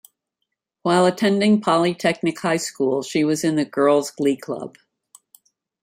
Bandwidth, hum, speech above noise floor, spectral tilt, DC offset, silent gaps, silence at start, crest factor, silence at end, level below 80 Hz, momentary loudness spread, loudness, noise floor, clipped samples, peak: 16 kHz; none; 60 dB; -5 dB/octave; under 0.1%; none; 0.85 s; 16 dB; 1.15 s; -66 dBFS; 10 LU; -20 LUFS; -79 dBFS; under 0.1%; -4 dBFS